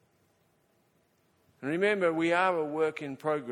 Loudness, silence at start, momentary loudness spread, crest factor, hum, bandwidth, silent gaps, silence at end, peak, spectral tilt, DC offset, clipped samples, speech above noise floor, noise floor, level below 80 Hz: -29 LUFS; 1.6 s; 9 LU; 18 dB; none; 12 kHz; none; 0 s; -12 dBFS; -6 dB/octave; under 0.1%; under 0.1%; 41 dB; -70 dBFS; -78 dBFS